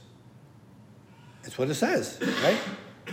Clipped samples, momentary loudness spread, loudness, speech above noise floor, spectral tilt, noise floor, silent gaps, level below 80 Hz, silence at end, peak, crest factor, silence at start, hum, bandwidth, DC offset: under 0.1%; 16 LU; -27 LUFS; 25 dB; -4.5 dB/octave; -52 dBFS; none; -72 dBFS; 0 s; -10 dBFS; 22 dB; 0 s; none; 16 kHz; under 0.1%